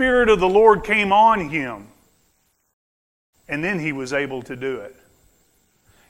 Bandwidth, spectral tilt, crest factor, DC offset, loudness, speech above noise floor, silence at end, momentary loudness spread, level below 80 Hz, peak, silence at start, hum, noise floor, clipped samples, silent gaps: 12 kHz; -5.5 dB/octave; 20 dB; under 0.1%; -18 LUFS; 47 dB; 1.2 s; 15 LU; -46 dBFS; 0 dBFS; 0 s; none; -65 dBFS; under 0.1%; 2.73-3.33 s